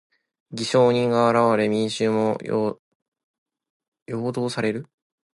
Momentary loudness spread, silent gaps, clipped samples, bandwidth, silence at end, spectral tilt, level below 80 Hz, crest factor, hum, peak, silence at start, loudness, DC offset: 13 LU; 2.79-3.12 s, 3.24-3.46 s, 3.70-3.80 s, 3.88-3.92 s, 4.02-4.06 s; under 0.1%; 11.5 kHz; 0.55 s; -6 dB/octave; -66 dBFS; 18 dB; none; -6 dBFS; 0.5 s; -22 LUFS; under 0.1%